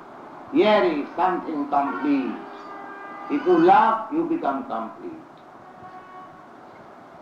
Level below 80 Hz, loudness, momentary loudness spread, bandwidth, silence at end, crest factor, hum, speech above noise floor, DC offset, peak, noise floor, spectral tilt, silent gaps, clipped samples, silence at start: -70 dBFS; -22 LUFS; 25 LU; 6.8 kHz; 0.05 s; 20 dB; none; 24 dB; under 0.1%; -4 dBFS; -45 dBFS; -7 dB/octave; none; under 0.1%; 0 s